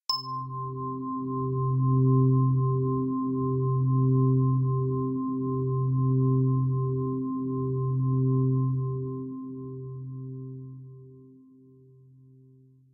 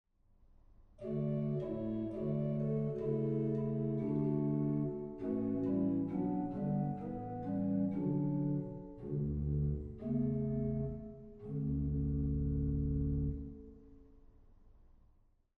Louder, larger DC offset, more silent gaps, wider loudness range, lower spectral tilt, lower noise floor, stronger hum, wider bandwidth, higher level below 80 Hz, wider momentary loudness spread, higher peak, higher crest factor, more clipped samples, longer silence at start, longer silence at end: first, -27 LUFS vs -37 LUFS; neither; neither; first, 14 LU vs 3 LU; second, -10.5 dB/octave vs -12.5 dB/octave; second, -56 dBFS vs -69 dBFS; neither; first, 4.3 kHz vs 3.1 kHz; second, -60 dBFS vs -48 dBFS; first, 15 LU vs 8 LU; first, -14 dBFS vs -24 dBFS; about the same, 12 dB vs 14 dB; neither; second, 0.1 s vs 0.7 s; first, 1.7 s vs 0.75 s